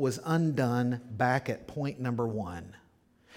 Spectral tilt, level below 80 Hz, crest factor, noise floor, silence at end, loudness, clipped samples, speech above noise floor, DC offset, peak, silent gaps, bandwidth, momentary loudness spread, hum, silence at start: -7 dB/octave; -62 dBFS; 18 dB; -64 dBFS; 0 s; -31 LUFS; under 0.1%; 33 dB; under 0.1%; -12 dBFS; none; 17 kHz; 10 LU; none; 0 s